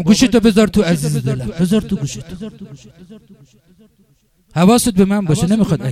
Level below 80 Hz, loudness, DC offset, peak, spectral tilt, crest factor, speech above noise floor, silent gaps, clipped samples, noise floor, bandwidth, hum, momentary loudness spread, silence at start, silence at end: -38 dBFS; -14 LUFS; under 0.1%; 0 dBFS; -6 dB/octave; 16 dB; 41 dB; none; under 0.1%; -56 dBFS; 15.5 kHz; none; 17 LU; 0 s; 0 s